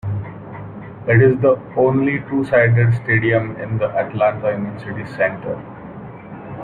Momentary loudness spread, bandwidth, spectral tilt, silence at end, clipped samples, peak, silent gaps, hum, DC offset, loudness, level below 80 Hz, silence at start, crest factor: 20 LU; 4.6 kHz; -10 dB/octave; 0 s; under 0.1%; -2 dBFS; none; none; under 0.1%; -18 LUFS; -50 dBFS; 0.05 s; 16 dB